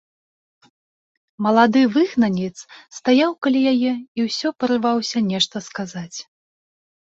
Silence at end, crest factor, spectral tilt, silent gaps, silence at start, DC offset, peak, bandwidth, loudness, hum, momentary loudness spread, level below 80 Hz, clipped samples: 0.8 s; 18 dB; -5 dB/octave; 4.08-4.15 s; 1.4 s; under 0.1%; -2 dBFS; 7.8 kHz; -19 LUFS; none; 14 LU; -64 dBFS; under 0.1%